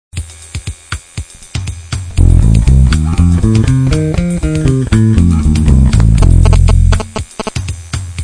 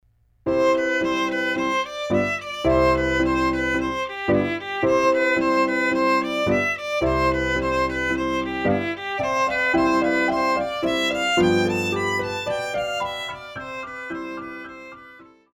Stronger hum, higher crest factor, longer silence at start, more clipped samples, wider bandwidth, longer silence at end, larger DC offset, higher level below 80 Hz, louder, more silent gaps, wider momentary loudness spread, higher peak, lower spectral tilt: neither; second, 10 dB vs 16 dB; second, 0.15 s vs 0.45 s; first, 1% vs under 0.1%; second, 10.5 kHz vs 15 kHz; second, 0 s vs 0.3 s; neither; first, -14 dBFS vs -42 dBFS; first, -11 LUFS vs -22 LUFS; neither; first, 16 LU vs 12 LU; first, 0 dBFS vs -6 dBFS; first, -7 dB/octave vs -5 dB/octave